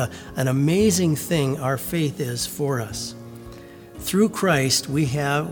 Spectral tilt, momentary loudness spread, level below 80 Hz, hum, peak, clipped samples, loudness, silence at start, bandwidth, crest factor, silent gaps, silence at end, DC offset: -5 dB/octave; 20 LU; -50 dBFS; none; -6 dBFS; under 0.1%; -22 LUFS; 0 s; over 20 kHz; 16 dB; none; 0 s; under 0.1%